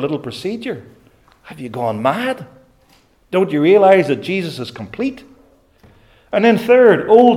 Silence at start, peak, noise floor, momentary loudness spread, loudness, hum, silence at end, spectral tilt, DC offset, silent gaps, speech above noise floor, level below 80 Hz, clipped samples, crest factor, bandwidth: 0 s; 0 dBFS; -53 dBFS; 18 LU; -15 LUFS; none; 0 s; -6.5 dB/octave; under 0.1%; none; 39 dB; -58 dBFS; under 0.1%; 16 dB; 15 kHz